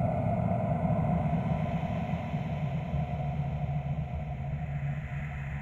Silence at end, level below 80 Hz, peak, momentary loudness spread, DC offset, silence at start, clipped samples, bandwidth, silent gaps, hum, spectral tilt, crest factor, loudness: 0 s; -42 dBFS; -16 dBFS; 7 LU; under 0.1%; 0 s; under 0.1%; 7.2 kHz; none; none; -9.5 dB/octave; 14 dB; -32 LUFS